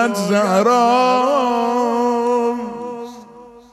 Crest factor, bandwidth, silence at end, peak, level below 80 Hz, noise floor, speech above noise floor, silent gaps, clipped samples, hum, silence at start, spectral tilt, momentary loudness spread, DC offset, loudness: 14 dB; 13.5 kHz; 0.15 s; -2 dBFS; -62 dBFS; -41 dBFS; 26 dB; none; under 0.1%; none; 0 s; -5 dB/octave; 15 LU; under 0.1%; -16 LUFS